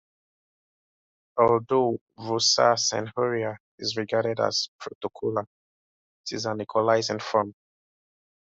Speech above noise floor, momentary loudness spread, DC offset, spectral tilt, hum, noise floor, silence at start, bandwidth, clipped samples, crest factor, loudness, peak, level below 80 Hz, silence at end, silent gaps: over 65 dB; 13 LU; under 0.1%; -3.5 dB/octave; none; under -90 dBFS; 1.35 s; 8 kHz; under 0.1%; 22 dB; -25 LUFS; -6 dBFS; -68 dBFS; 0.9 s; 2.01-2.07 s, 3.60-3.78 s, 4.68-4.79 s, 4.95-5.01 s, 5.47-6.24 s